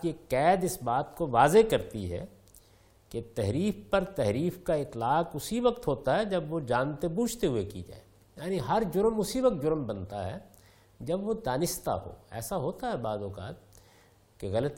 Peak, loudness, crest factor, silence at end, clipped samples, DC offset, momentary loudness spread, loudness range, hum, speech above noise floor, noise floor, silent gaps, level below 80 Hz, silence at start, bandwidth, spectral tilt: -8 dBFS; -30 LUFS; 22 dB; 0 s; under 0.1%; under 0.1%; 15 LU; 5 LU; none; 31 dB; -61 dBFS; none; -52 dBFS; 0 s; 17 kHz; -5.5 dB/octave